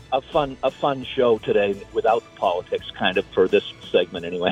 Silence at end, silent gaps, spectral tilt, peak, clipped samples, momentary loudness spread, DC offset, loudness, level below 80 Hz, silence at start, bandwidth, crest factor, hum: 0 s; none; -6 dB/octave; -6 dBFS; under 0.1%; 5 LU; under 0.1%; -22 LUFS; -52 dBFS; 0.1 s; 9.2 kHz; 16 dB; none